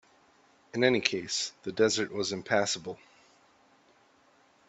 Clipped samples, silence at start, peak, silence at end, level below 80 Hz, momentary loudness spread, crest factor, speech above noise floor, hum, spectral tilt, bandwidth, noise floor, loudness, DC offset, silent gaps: under 0.1%; 0.75 s; -6 dBFS; 1.75 s; -72 dBFS; 12 LU; 26 dB; 35 dB; none; -3 dB/octave; 8.4 kHz; -64 dBFS; -29 LUFS; under 0.1%; none